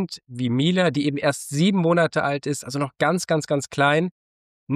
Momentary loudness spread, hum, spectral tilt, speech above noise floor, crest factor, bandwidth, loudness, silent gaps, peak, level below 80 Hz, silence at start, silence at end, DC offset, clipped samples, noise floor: 8 LU; none; -5.5 dB/octave; over 68 dB; 14 dB; 15 kHz; -22 LUFS; 4.11-4.67 s; -8 dBFS; -66 dBFS; 0 s; 0 s; under 0.1%; under 0.1%; under -90 dBFS